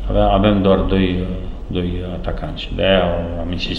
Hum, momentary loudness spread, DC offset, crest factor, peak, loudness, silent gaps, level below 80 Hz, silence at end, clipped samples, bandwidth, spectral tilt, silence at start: none; 12 LU; under 0.1%; 16 dB; 0 dBFS; -18 LUFS; none; -26 dBFS; 0 s; under 0.1%; 7 kHz; -8 dB/octave; 0 s